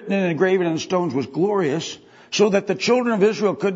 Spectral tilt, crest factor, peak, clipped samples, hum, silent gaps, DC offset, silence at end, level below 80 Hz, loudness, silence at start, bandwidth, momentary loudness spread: -5 dB/octave; 16 dB; -4 dBFS; under 0.1%; none; none; under 0.1%; 0 s; -68 dBFS; -20 LUFS; 0 s; 8 kHz; 8 LU